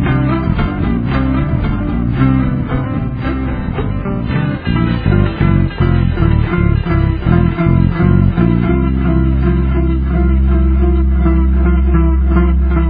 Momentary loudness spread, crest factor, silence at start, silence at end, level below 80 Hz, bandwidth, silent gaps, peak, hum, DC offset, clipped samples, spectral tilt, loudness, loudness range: 5 LU; 12 dB; 0 s; 0 s; -16 dBFS; 4.8 kHz; none; 0 dBFS; none; under 0.1%; under 0.1%; -11.5 dB/octave; -14 LUFS; 3 LU